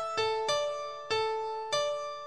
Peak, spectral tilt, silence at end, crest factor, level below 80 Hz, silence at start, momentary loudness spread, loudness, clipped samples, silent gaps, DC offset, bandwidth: -18 dBFS; -1 dB/octave; 0 s; 16 dB; -68 dBFS; 0 s; 5 LU; -32 LUFS; under 0.1%; none; 0.2%; 12 kHz